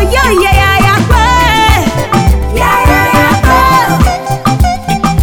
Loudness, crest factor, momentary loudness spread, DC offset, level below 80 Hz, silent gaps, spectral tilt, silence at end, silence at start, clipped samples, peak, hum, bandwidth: -8 LUFS; 8 dB; 5 LU; under 0.1%; -14 dBFS; none; -5 dB/octave; 0 s; 0 s; 0.8%; 0 dBFS; none; 18.5 kHz